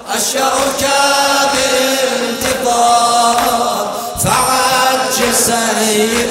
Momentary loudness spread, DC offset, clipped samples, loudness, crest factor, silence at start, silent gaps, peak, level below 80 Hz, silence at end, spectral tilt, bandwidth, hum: 5 LU; under 0.1%; under 0.1%; -12 LUFS; 14 dB; 0 s; none; 0 dBFS; -42 dBFS; 0 s; -1.5 dB/octave; 16.5 kHz; none